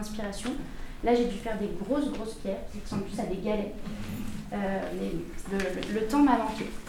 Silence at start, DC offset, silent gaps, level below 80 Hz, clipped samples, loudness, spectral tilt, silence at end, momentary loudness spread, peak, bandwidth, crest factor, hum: 0 s; under 0.1%; none; -42 dBFS; under 0.1%; -31 LUFS; -6 dB/octave; 0 s; 13 LU; -10 dBFS; 17.5 kHz; 20 dB; none